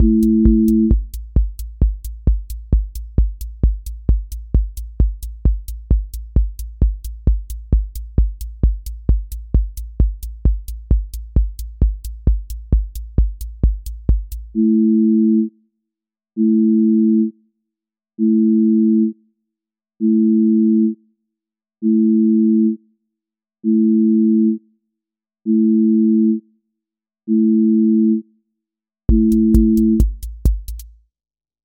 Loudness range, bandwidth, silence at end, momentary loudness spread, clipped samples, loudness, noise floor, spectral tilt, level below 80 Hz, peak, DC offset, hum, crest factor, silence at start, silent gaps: 6 LU; 16.5 kHz; 0.75 s; 10 LU; under 0.1%; -18 LUFS; -86 dBFS; -10 dB/octave; -22 dBFS; 0 dBFS; under 0.1%; none; 16 dB; 0 s; none